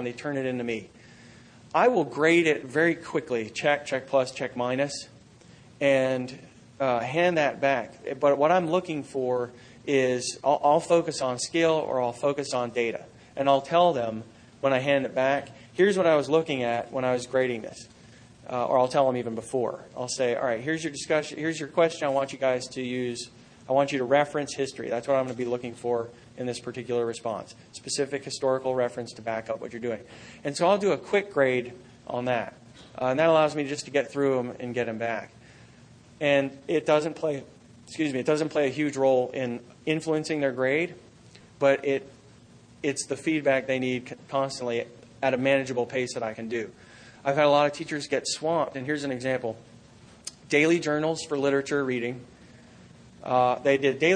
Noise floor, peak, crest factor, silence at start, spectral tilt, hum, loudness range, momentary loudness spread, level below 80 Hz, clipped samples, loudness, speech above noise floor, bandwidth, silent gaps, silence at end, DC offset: -53 dBFS; -8 dBFS; 20 dB; 0 s; -4.5 dB/octave; none; 4 LU; 12 LU; -66 dBFS; under 0.1%; -26 LUFS; 27 dB; 10 kHz; none; 0 s; under 0.1%